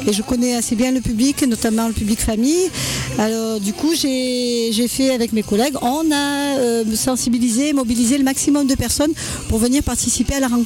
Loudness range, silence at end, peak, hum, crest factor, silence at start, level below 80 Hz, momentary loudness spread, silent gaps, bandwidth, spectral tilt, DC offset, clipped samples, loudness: 1 LU; 0 s; -4 dBFS; none; 14 dB; 0 s; -36 dBFS; 3 LU; none; 17.5 kHz; -4 dB/octave; under 0.1%; under 0.1%; -18 LUFS